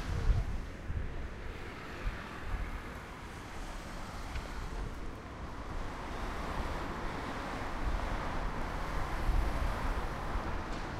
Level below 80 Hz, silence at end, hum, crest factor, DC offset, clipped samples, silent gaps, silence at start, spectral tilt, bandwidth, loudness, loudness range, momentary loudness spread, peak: -38 dBFS; 0 s; none; 18 dB; under 0.1%; under 0.1%; none; 0 s; -5.5 dB/octave; 14 kHz; -40 LUFS; 6 LU; 9 LU; -18 dBFS